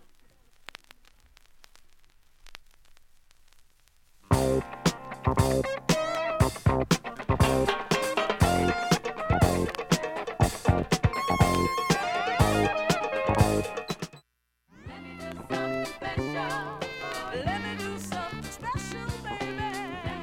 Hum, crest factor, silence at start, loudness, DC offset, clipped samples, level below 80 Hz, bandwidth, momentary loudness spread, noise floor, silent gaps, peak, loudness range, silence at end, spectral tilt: none; 22 dB; 1.55 s; -28 LUFS; under 0.1%; under 0.1%; -40 dBFS; 17.5 kHz; 11 LU; -73 dBFS; none; -8 dBFS; 8 LU; 0 s; -5 dB/octave